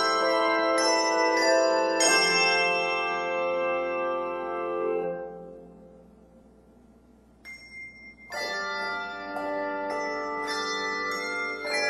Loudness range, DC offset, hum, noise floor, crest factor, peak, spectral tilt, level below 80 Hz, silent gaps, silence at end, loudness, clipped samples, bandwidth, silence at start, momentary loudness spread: 15 LU; under 0.1%; none; -56 dBFS; 18 dB; -10 dBFS; -1.5 dB/octave; -64 dBFS; none; 0 s; -26 LUFS; under 0.1%; 13.5 kHz; 0 s; 20 LU